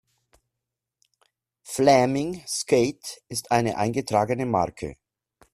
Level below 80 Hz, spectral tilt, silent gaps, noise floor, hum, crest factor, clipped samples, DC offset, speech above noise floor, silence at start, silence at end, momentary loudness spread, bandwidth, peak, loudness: -58 dBFS; -5 dB/octave; none; -85 dBFS; none; 22 dB; under 0.1%; under 0.1%; 62 dB; 1.65 s; 0.6 s; 14 LU; 14.5 kHz; -4 dBFS; -24 LUFS